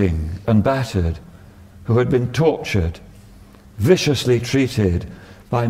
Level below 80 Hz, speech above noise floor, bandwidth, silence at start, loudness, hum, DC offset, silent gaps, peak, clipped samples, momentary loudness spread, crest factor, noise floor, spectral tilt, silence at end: -36 dBFS; 26 dB; 16 kHz; 0 s; -19 LUFS; none; under 0.1%; none; -2 dBFS; under 0.1%; 10 LU; 18 dB; -44 dBFS; -6.5 dB/octave; 0 s